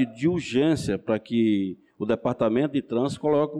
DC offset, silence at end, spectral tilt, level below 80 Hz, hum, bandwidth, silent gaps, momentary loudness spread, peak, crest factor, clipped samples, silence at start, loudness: under 0.1%; 0 s; -7 dB/octave; -56 dBFS; none; 11.5 kHz; none; 4 LU; -12 dBFS; 12 dB; under 0.1%; 0 s; -25 LUFS